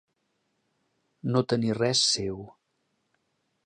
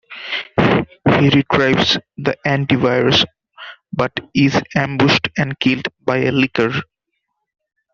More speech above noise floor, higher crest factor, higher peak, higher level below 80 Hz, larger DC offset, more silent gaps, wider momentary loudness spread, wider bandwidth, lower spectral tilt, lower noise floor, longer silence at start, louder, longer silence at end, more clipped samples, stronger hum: second, 50 dB vs 58 dB; about the same, 20 dB vs 18 dB; second, -10 dBFS vs 0 dBFS; second, -62 dBFS vs -48 dBFS; neither; neither; first, 14 LU vs 10 LU; first, 10 kHz vs 7.2 kHz; second, -4 dB/octave vs -6 dB/octave; about the same, -76 dBFS vs -74 dBFS; first, 1.25 s vs 0.1 s; second, -25 LUFS vs -16 LUFS; about the same, 1.15 s vs 1.1 s; neither; neither